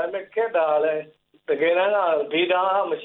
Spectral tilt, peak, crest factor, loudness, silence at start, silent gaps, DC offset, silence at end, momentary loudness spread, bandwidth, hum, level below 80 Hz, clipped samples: -7.5 dB/octave; -8 dBFS; 14 dB; -22 LUFS; 0 s; none; under 0.1%; 0 s; 8 LU; 4.1 kHz; none; -78 dBFS; under 0.1%